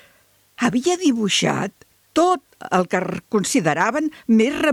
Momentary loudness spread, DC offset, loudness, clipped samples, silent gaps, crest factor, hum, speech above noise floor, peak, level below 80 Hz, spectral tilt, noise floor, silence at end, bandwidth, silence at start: 7 LU; under 0.1%; -20 LUFS; under 0.1%; none; 14 dB; none; 38 dB; -6 dBFS; -60 dBFS; -4 dB/octave; -57 dBFS; 0 s; 14.5 kHz; 0.6 s